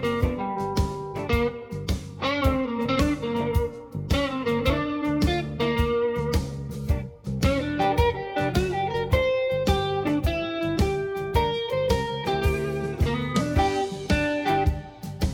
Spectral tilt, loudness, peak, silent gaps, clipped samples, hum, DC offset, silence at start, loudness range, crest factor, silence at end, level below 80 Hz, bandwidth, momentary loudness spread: -6 dB/octave; -25 LUFS; -8 dBFS; none; under 0.1%; none; under 0.1%; 0 s; 2 LU; 18 dB; 0 s; -32 dBFS; 18.5 kHz; 6 LU